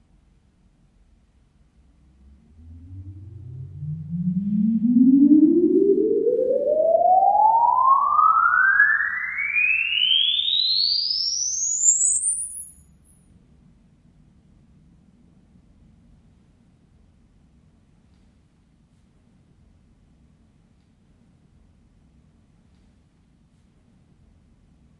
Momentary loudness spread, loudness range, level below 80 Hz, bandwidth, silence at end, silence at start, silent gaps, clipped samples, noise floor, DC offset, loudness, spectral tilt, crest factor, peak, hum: 19 LU; 12 LU; -60 dBFS; 11.5 kHz; 12.3 s; 2.65 s; none; under 0.1%; -59 dBFS; under 0.1%; -18 LUFS; -2.5 dB/octave; 20 dB; -4 dBFS; none